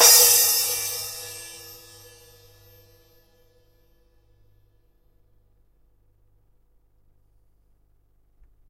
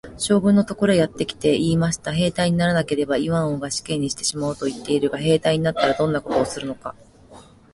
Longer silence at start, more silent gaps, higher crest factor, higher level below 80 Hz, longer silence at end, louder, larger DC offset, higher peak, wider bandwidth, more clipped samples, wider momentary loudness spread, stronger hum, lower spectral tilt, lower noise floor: about the same, 0 s vs 0.05 s; neither; first, 26 dB vs 16 dB; second, -60 dBFS vs -48 dBFS; first, 7.1 s vs 0.35 s; first, -17 LUFS vs -21 LUFS; neither; first, 0 dBFS vs -4 dBFS; first, 16 kHz vs 11.5 kHz; neither; first, 30 LU vs 7 LU; first, 50 Hz at -65 dBFS vs none; second, 2.5 dB/octave vs -5 dB/octave; first, -61 dBFS vs -47 dBFS